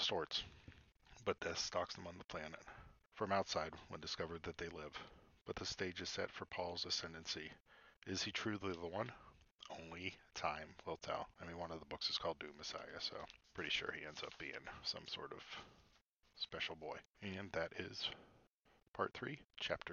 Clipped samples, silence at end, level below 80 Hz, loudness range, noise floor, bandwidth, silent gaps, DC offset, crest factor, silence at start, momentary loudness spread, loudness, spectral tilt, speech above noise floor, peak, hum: under 0.1%; 0 s; -70 dBFS; 3 LU; -76 dBFS; 7.2 kHz; 7.60-7.65 s, 7.97-8.01 s, 9.55-9.59 s, 16.08-16.21 s, 17.05-17.14 s, 18.53-18.60 s, 18.88-18.94 s, 19.45-19.50 s; under 0.1%; 24 dB; 0 s; 13 LU; -45 LUFS; -1.5 dB/octave; 29 dB; -22 dBFS; none